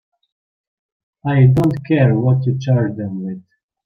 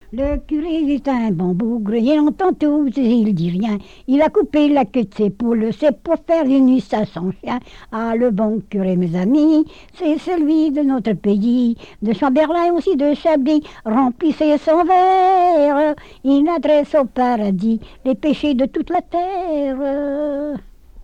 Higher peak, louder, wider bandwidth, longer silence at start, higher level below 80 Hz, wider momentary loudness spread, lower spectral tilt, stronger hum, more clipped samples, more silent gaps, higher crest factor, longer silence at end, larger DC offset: first, -2 dBFS vs -6 dBFS; about the same, -16 LUFS vs -17 LUFS; second, 6.2 kHz vs 8 kHz; first, 1.25 s vs 0.1 s; second, -50 dBFS vs -42 dBFS; first, 14 LU vs 8 LU; first, -9.5 dB/octave vs -8 dB/octave; neither; neither; neither; first, 16 dB vs 10 dB; first, 0.45 s vs 0 s; second, under 0.1% vs 0.4%